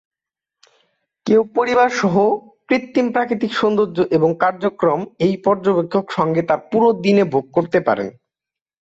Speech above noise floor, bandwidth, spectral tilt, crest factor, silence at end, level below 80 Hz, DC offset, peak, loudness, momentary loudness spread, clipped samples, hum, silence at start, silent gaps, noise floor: 71 dB; 7.8 kHz; -6.5 dB/octave; 14 dB; 0.75 s; -60 dBFS; under 0.1%; -4 dBFS; -17 LUFS; 5 LU; under 0.1%; none; 1.25 s; none; -88 dBFS